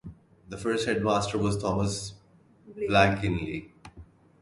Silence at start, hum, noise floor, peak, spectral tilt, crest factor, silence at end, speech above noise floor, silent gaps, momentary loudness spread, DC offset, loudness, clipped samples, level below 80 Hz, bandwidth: 0.05 s; none; -58 dBFS; -6 dBFS; -5.5 dB/octave; 24 dB; 0.4 s; 32 dB; none; 16 LU; under 0.1%; -27 LUFS; under 0.1%; -48 dBFS; 11.5 kHz